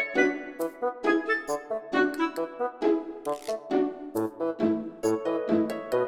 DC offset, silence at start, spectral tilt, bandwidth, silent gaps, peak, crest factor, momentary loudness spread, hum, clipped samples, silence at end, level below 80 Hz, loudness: under 0.1%; 0 s; -5 dB/octave; 18 kHz; none; -10 dBFS; 18 dB; 7 LU; none; under 0.1%; 0 s; -68 dBFS; -28 LUFS